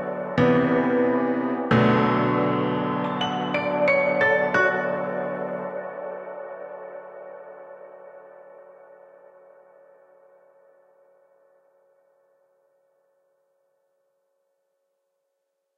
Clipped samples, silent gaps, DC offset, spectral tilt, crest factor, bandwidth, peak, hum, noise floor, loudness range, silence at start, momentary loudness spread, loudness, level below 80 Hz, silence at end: under 0.1%; none; under 0.1%; -7.5 dB/octave; 20 dB; 7.4 kHz; -8 dBFS; none; -78 dBFS; 21 LU; 0 s; 22 LU; -23 LUFS; -62 dBFS; 7.15 s